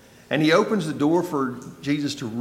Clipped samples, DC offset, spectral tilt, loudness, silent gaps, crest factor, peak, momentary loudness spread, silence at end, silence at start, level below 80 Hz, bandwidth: under 0.1%; under 0.1%; -5.5 dB/octave; -23 LUFS; none; 16 dB; -6 dBFS; 9 LU; 0 s; 0.3 s; -64 dBFS; 15.5 kHz